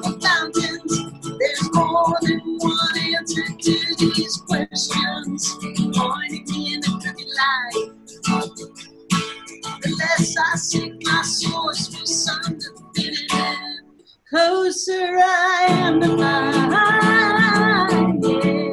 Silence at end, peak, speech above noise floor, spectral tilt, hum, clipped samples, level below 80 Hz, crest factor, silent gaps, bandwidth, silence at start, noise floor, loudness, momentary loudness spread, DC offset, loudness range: 0 s; -4 dBFS; 35 dB; -3.5 dB/octave; none; under 0.1%; -56 dBFS; 16 dB; none; 12.5 kHz; 0 s; -51 dBFS; -19 LUFS; 11 LU; under 0.1%; 7 LU